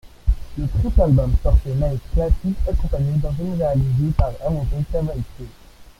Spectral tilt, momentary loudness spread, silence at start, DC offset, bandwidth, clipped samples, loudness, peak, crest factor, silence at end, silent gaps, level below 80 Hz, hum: -9.5 dB/octave; 8 LU; 0.05 s; under 0.1%; 11.5 kHz; under 0.1%; -21 LUFS; -2 dBFS; 16 dB; 0.15 s; none; -22 dBFS; none